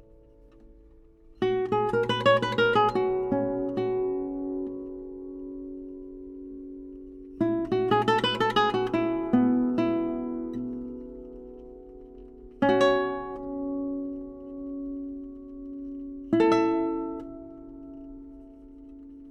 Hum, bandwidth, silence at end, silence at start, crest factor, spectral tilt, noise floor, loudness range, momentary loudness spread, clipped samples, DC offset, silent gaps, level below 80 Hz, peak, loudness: none; 9.6 kHz; 0 s; 0.65 s; 18 dB; -6.5 dB/octave; -54 dBFS; 8 LU; 22 LU; under 0.1%; under 0.1%; none; -54 dBFS; -10 dBFS; -27 LUFS